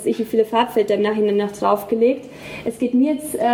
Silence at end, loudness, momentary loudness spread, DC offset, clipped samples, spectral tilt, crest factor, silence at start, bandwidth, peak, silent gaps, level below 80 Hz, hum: 0 s; -19 LUFS; 9 LU; under 0.1%; under 0.1%; -5.5 dB/octave; 16 dB; 0 s; 17.5 kHz; -2 dBFS; none; -58 dBFS; none